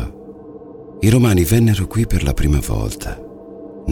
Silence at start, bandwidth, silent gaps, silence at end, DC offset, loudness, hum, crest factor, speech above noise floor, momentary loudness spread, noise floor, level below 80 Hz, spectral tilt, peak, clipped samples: 0 s; 19 kHz; none; 0 s; under 0.1%; -17 LUFS; none; 18 dB; 21 dB; 23 LU; -36 dBFS; -26 dBFS; -6.5 dB/octave; 0 dBFS; under 0.1%